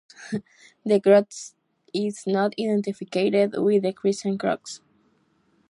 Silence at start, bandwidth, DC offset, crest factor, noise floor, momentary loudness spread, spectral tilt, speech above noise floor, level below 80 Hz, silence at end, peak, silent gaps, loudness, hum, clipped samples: 0.2 s; 11.5 kHz; under 0.1%; 20 dB; -65 dBFS; 17 LU; -5.5 dB/octave; 42 dB; -72 dBFS; 0.95 s; -4 dBFS; none; -23 LUFS; none; under 0.1%